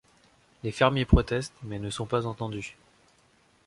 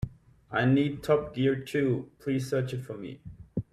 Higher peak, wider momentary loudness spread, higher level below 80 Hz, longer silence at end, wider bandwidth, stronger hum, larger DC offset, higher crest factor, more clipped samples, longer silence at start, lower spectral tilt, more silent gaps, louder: first, -4 dBFS vs -12 dBFS; about the same, 14 LU vs 15 LU; first, -36 dBFS vs -54 dBFS; first, 0.95 s vs 0.1 s; second, 11.5 kHz vs 14.5 kHz; neither; neither; first, 24 dB vs 16 dB; neither; first, 0.65 s vs 0 s; second, -6 dB/octave vs -7.5 dB/octave; neither; about the same, -28 LUFS vs -29 LUFS